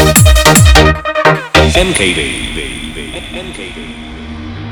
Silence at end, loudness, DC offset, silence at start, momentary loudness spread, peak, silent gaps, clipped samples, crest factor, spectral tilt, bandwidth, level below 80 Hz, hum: 0 s; -8 LUFS; under 0.1%; 0 s; 20 LU; 0 dBFS; none; 1%; 10 dB; -4 dB/octave; over 20 kHz; -18 dBFS; none